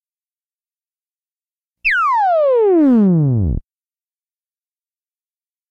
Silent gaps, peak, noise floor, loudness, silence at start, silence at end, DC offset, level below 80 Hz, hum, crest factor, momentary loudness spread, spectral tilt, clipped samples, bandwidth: none; -6 dBFS; under -90 dBFS; -14 LUFS; 1.85 s; 2.1 s; under 0.1%; -36 dBFS; none; 12 dB; 8 LU; -9.5 dB/octave; under 0.1%; 7.4 kHz